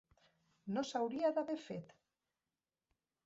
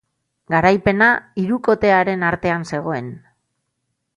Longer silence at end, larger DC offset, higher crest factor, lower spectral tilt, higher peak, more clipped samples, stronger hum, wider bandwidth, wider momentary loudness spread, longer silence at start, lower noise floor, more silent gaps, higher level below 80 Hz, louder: first, 1.4 s vs 1 s; neither; about the same, 20 dB vs 18 dB; second, -5 dB/octave vs -7 dB/octave; second, -24 dBFS vs -2 dBFS; neither; neither; second, 7.6 kHz vs 11 kHz; first, 13 LU vs 10 LU; first, 0.65 s vs 0.5 s; first, under -90 dBFS vs -74 dBFS; neither; second, -82 dBFS vs -48 dBFS; second, -40 LUFS vs -17 LUFS